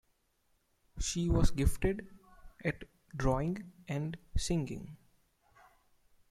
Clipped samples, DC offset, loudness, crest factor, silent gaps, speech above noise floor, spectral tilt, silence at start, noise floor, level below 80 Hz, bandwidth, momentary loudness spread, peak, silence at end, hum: under 0.1%; under 0.1%; -35 LUFS; 22 dB; none; 43 dB; -5.5 dB/octave; 0.95 s; -75 dBFS; -40 dBFS; 14 kHz; 15 LU; -14 dBFS; 1.35 s; none